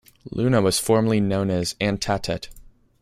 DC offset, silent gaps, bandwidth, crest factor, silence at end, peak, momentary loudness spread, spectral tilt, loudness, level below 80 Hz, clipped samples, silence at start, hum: under 0.1%; none; 16 kHz; 18 dB; 0.4 s; -4 dBFS; 11 LU; -5 dB/octave; -22 LUFS; -46 dBFS; under 0.1%; 0.25 s; none